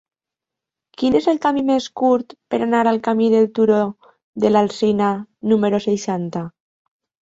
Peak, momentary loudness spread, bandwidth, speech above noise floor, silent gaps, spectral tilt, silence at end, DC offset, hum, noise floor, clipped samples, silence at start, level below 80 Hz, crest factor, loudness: -2 dBFS; 9 LU; 8 kHz; 69 dB; 4.23-4.33 s; -6.5 dB/octave; 0.7 s; under 0.1%; none; -86 dBFS; under 0.1%; 1 s; -58 dBFS; 16 dB; -18 LUFS